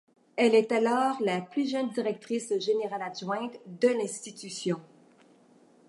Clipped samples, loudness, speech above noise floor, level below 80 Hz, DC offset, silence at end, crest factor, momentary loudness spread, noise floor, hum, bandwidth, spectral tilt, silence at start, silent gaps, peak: under 0.1%; -29 LUFS; 32 dB; -84 dBFS; under 0.1%; 1.05 s; 20 dB; 12 LU; -60 dBFS; none; 11.5 kHz; -4.5 dB/octave; 0.35 s; none; -10 dBFS